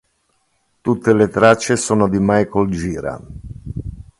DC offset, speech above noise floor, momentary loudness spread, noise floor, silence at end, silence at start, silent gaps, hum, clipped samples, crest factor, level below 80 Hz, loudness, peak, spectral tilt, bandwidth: under 0.1%; 49 dB; 18 LU; -65 dBFS; 0.2 s; 0.85 s; none; none; under 0.1%; 18 dB; -40 dBFS; -16 LUFS; 0 dBFS; -5.5 dB/octave; 11.5 kHz